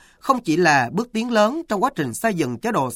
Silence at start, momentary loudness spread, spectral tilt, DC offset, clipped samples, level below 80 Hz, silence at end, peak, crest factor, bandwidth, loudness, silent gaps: 0.25 s; 7 LU; -5 dB/octave; under 0.1%; under 0.1%; -58 dBFS; 0 s; -2 dBFS; 18 dB; 16.5 kHz; -20 LUFS; none